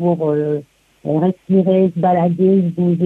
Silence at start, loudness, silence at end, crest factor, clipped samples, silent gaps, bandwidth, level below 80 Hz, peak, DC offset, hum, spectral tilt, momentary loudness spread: 0 s; -16 LUFS; 0 s; 12 dB; under 0.1%; none; 3.8 kHz; -60 dBFS; -4 dBFS; under 0.1%; none; -11 dB/octave; 8 LU